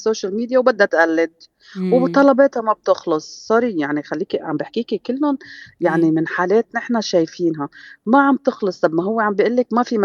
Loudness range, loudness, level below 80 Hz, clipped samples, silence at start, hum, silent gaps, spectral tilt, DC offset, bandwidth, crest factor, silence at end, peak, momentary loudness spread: 4 LU; -18 LUFS; -68 dBFS; under 0.1%; 0 s; none; none; -6 dB/octave; under 0.1%; 7.2 kHz; 18 dB; 0 s; 0 dBFS; 9 LU